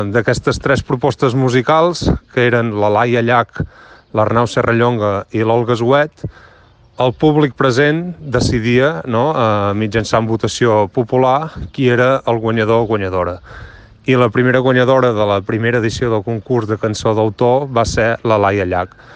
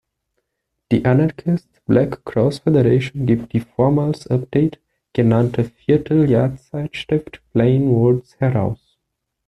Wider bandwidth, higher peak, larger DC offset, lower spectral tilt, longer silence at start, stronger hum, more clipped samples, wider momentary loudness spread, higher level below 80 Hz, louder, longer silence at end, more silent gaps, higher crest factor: about the same, 9.6 kHz vs 10.5 kHz; about the same, 0 dBFS vs -2 dBFS; neither; second, -6.5 dB/octave vs -9 dB/octave; second, 0 s vs 0.9 s; neither; neither; about the same, 6 LU vs 8 LU; first, -38 dBFS vs -48 dBFS; first, -15 LUFS vs -18 LUFS; second, 0.3 s vs 0.7 s; neither; about the same, 14 dB vs 16 dB